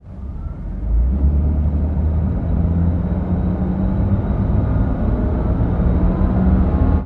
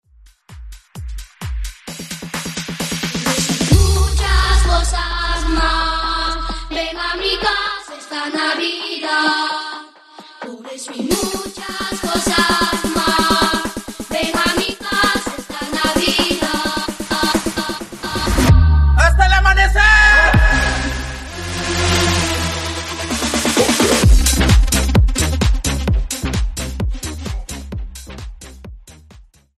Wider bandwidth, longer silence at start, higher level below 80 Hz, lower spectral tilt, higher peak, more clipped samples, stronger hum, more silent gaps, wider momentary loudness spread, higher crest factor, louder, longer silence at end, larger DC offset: second, 3.9 kHz vs 13.5 kHz; second, 0.05 s vs 0.5 s; about the same, -20 dBFS vs -20 dBFS; first, -12 dB/octave vs -4 dB/octave; second, -4 dBFS vs 0 dBFS; neither; neither; neither; second, 5 LU vs 16 LU; about the same, 14 dB vs 16 dB; second, -19 LUFS vs -16 LUFS; second, 0 s vs 0.35 s; neither